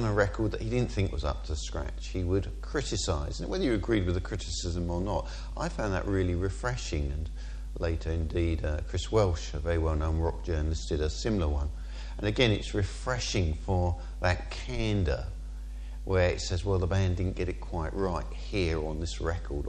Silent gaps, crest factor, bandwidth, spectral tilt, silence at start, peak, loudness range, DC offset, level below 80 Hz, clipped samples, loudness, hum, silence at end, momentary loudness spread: none; 20 dB; 9.8 kHz; -5.5 dB/octave; 0 s; -8 dBFS; 2 LU; under 0.1%; -36 dBFS; under 0.1%; -31 LUFS; none; 0 s; 8 LU